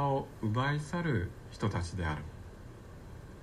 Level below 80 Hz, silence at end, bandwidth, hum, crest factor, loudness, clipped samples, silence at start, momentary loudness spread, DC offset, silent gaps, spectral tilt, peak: -52 dBFS; 0 s; 13.5 kHz; none; 14 dB; -35 LUFS; under 0.1%; 0 s; 17 LU; under 0.1%; none; -6.5 dB/octave; -20 dBFS